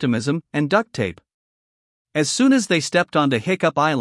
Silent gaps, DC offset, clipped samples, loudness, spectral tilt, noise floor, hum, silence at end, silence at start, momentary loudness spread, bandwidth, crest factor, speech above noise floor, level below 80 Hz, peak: 1.34-2.05 s; under 0.1%; under 0.1%; -20 LUFS; -4.5 dB/octave; under -90 dBFS; none; 0 s; 0 s; 9 LU; 12 kHz; 18 dB; over 71 dB; -64 dBFS; -4 dBFS